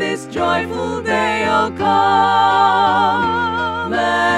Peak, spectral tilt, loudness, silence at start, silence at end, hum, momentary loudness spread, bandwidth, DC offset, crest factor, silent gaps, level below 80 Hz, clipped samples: -2 dBFS; -4.5 dB/octave; -16 LUFS; 0 s; 0 s; none; 7 LU; 12 kHz; under 0.1%; 14 dB; none; -48 dBFS; under 0.1%